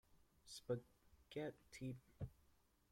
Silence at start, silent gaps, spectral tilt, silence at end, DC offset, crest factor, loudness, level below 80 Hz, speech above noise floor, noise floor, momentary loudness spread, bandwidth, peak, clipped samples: 0.15 s; none; -6 dB/octave; 0.6 s; under 0.1%; 22 dB; -52 LUFS; -72 dBFS; 26 dB; -77 dBFS; 8 LU; 16.5 kHz; -32 dBFS; under 0.1%